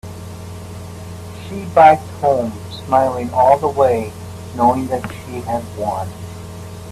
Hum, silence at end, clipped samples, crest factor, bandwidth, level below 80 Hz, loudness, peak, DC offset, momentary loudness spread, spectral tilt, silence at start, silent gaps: none; 0 s; under 0.1%; 18 dB; 14.5 kHz; -48 dBFS; -16 LUFS; 0 dBFS; under 0.1%; 21 LU; -6.5 dB/octave; 0.05 s; none